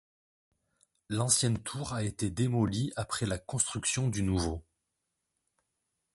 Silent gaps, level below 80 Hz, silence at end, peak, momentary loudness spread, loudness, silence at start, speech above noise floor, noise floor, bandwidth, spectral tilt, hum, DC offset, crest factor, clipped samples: none; -50 dBFS; 1.55 s; -10 dBFS; 9 LU; -31 LUFS; 1.1 s; 53 dB; -84 dBFS; 12 kHz; -4 dB/octave; none; under 0.1%; 22 dB; under 0.1%